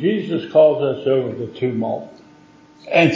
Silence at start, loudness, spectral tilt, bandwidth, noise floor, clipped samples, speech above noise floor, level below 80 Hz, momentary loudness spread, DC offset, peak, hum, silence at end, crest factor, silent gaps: 0 s; -19 LUFS; -7 dB/octave; 7.6 kHz; -48 dBFS; under 0.1%; 30 dB; -62 dBFS; 11 LU; under 0.1%; -2 dBFS; none; 0 s; 16 dB; none